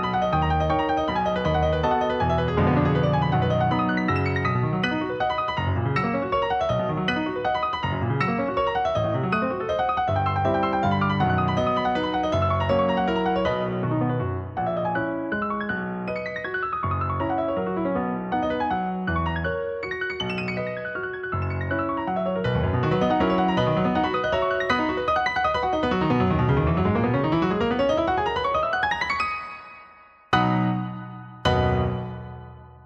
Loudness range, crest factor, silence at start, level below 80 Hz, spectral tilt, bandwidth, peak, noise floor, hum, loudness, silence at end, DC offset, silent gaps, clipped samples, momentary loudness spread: 4 LU; 16 dB; 0 s; -44 dBFS; -7.5 dB/octave; 8 kHz; -8 dBFS; -50 dBFS; none; -24 LUFS; 0.05 s; under 0.1%; none; under 0.1%; 6 LU